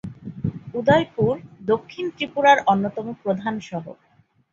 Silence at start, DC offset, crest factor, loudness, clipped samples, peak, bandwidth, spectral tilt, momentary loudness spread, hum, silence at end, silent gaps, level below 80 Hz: 0.05 s; under 0.1%; 20 dB; -22 LUFS; under 0.1%; -2 dBFS; 7.4 kHz; -6.5 dB/octave; 15 LU; none; 0.6 s; none; -54 dBFS